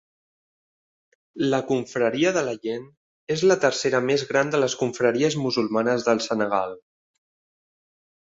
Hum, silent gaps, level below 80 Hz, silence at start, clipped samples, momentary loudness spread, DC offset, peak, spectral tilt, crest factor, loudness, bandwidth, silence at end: none; 2.97-3.27 s; -66 dBFS; 1.35 s; under 0.1%; 7 LU; under 0.1%; -4 dBFS; -4.5 dB/octave; 20 dB; -23 LUFS; 8 kHz; 1.6 s